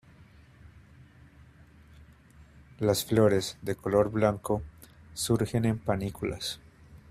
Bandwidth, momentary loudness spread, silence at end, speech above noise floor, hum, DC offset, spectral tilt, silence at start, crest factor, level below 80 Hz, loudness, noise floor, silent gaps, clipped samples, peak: 15.5 kHz; 12 LU; 0.15 s; 28 dB; none; under 0.1%; -5.5 dB/octave; 0.65 s; 22 dB; -54 dBFS; -28 LUFS; -55 dBFS; none; under 0.1%; -8 dBFS